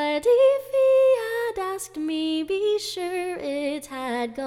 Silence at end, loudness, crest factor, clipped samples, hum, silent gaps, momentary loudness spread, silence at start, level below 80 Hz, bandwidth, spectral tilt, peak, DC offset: 0 s; -23 LUFS; 14 dB; under 0.1%; none; none; 11 LU; 0 s; -62 dBFS; 16 kHz; -3 dB/octave; -10 dBFS; under 0.1%